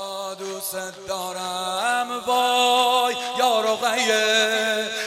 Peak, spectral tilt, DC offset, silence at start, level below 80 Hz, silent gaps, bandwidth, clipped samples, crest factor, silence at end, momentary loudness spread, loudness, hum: -6 dBFS; -1 dB/octave; under 0.1%; 0 s; -70 dBFS; none; 16.5 kHz; under 0.1%; 16 dB; 0 s; 12 LU; -21 LUFS; none